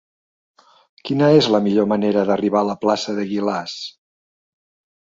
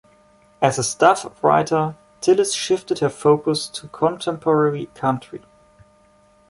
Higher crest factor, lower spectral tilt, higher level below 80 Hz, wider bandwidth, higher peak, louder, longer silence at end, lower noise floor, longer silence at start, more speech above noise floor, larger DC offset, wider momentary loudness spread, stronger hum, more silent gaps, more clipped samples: about the same, 18 dB vs 20 dB; first, -6 dB/octave vs -4.5 dB/octave; about the same, -62 dBFS vs -60 dBFS; second, 7.8 kHz vs 11.5 kHz; about the same, -2 dBFS vs -2 dBFS; about the same, -18 LUFS vs -20 LUFS; about the same, 1.15 s vs 1.1 s; first, under -90 dBFS vs -55 dBFS; first, 1.05 s vs 0.6 s; first, over 72 dB vs 36 dB; neither; first, 15 LU vs 8 LU; neither; neither; neither